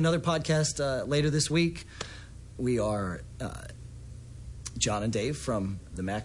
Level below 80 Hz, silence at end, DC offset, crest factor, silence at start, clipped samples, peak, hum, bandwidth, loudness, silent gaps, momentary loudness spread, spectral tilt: -48 dBFS; 0 s; under 0.1%; 18 dB; 0 s; under 0.1%; -12 dBFS; none; 11.5 kHz; -30 LUFS; none; 19 LU; -5 dB/octave